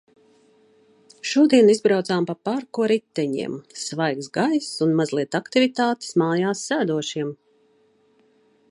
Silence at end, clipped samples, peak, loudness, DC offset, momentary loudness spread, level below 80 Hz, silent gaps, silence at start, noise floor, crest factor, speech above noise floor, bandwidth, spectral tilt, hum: 1.35 s; under 0.1%; -4 dBFS; -22 LUFS; under 0.1%; 12 LU; -72 dBFS; none; 1.25 s; -61 dBFS; 20 dB; 40 dB; 11.5 kHz; -5 dB/octave; none